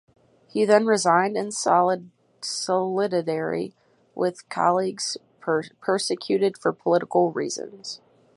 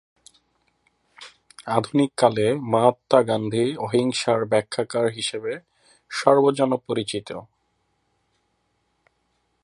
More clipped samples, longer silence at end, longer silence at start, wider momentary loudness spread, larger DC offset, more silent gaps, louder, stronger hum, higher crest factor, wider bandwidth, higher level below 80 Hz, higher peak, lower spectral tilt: neither; second, 0.4 s vs 2.2 s; second, 0.55 s vs 1.2 s; about the same, 13 LU vs 14 LU; neither; neither; about the same, -24 LUFS vs -22 LUFS; neither; about the same, 20 dB vs 22 dB; about the same, 11.5 kHz vs 11.5 kHz; second, -74 dBFS vs -66 dBFS; second, -4 dBFS vs 0 dBFS; about the same, -4 dB/octave vs -5 dB/octave